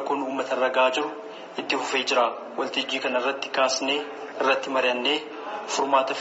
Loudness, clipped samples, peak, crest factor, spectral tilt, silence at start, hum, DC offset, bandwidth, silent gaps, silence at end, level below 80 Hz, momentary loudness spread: -25 LUFS; under 0.1%; -8 dBFS; 18 dB; 1 dB/octave; 0 s; none; under 0.1%; 8 kHz; none; 0 s; -78 dBFS; 11 LU